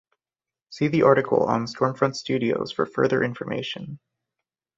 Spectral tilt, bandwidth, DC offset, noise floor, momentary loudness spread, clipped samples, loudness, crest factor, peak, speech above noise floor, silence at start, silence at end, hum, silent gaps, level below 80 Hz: -6.5 dB/octave; 7.8 kHz; under 0.1%; under -90 dBFS; 11 LU; under 0.1%; -23 LUFS; 22 dB; -2 dBFS; over 67 dB; 0.7 s; 0.8 s; none; none; -62 dBFS